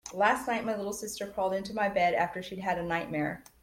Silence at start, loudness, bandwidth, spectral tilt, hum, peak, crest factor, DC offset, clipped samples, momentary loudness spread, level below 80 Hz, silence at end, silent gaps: 0.05 s; -31 LUFS; 16.5 kHz; -4.5 dB/octave; none; -12 dBFS; 20 dB; under 0.1%; under 0.1%; 9 LU; -60 dBFS; 0.2 s; none